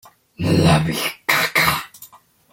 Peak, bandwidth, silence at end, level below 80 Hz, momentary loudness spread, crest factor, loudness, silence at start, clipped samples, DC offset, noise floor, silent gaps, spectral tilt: -2 dBFS; 16.5 kHz; 0.45 s; -46 dBFS; 11 LU; 18 dB; -18 LUFS; 0.4 s; under 0.1%; under 0.1%; -46 dBFS; none; -4.5 dB/octave